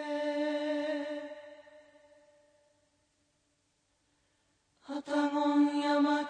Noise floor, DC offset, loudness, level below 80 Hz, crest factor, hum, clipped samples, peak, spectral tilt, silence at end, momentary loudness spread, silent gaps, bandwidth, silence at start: -76 dBFS; under 0.1%; -32 LUFS; -86 dBFS; 16 dB; none; under 0.1%; -18 dBFS; -3.5 dB/octave; 0 s; 16 LU; none; 9.2 kHz; 0 s